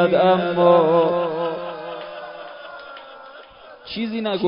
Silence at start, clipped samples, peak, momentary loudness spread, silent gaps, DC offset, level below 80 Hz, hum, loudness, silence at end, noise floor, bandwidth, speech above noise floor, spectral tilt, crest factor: 0 s; under 0.1%; -4 dBFS; 24 LU; none; under 0.1%; -62 dBFS; none; -19 LUFS; 0 s; -43 dBFS; 5.4 kHz; 26 dB; -11 dB/octave; 16 dB